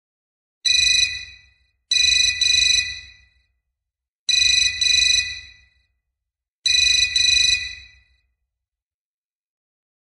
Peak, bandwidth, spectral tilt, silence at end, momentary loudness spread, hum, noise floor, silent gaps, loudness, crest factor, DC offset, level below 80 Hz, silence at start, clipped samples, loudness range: -6 dBFS; 16 kHz; 3.5 dB/octave; 2.35 s; 14 LU; none; under -90 dBFS; 4.08-4.27 s, 6.55-6.63 s; -15 LUFS; 16 dB; under 0.1%; -48 dBFS; 0.65 s; under 0.1%; 2 LU